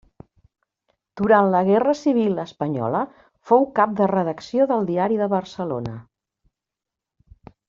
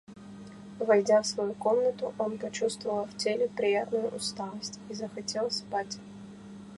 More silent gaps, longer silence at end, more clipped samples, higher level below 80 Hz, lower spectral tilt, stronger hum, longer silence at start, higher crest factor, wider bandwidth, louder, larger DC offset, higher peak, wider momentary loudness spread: neither; first, 1.65 s vs 0 s; neither; first, -60 dBFS vs -68 dBFS; first, -6.5 dB/octave vs -3.5 dB/octave; neither; first, 1.15 s vs 0.1 s; about the same, 18 dB vs 18 dB; second, 7.4 kHz vs 11.5 kHz; first, -21 LUFS vs -30 LUFS; neither; first, -4 dBFS vs -12 dBFS; second, 11 LU vs 21 LU